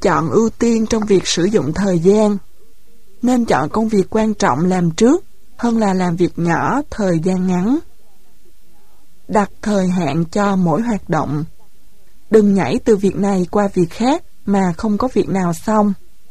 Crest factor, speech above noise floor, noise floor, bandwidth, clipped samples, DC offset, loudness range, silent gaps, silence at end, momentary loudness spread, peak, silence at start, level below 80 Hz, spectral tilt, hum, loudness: 16 dB; 39 dB; -54 dBFS; 13 kHz; under 0.1%; 3%; 4 LU; none; 0.35 s; 5 LU; 0 dBFS; 0 s; -42 dBFS; -6.5 dB/octave; none; -16 LUFS